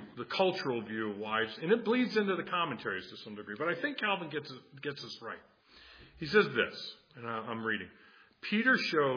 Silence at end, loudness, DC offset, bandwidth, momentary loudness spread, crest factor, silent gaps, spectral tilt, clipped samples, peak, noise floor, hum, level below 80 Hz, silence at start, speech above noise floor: 0 s; -33 LUFS; under 0.1%; 5.2 kHz; 17 LU; 22 dB; none; -5.5 dB/octave; under 0.1%; -12 dBFS; -57 dBFS; none; -72 dBFS; 0 s; 24 dB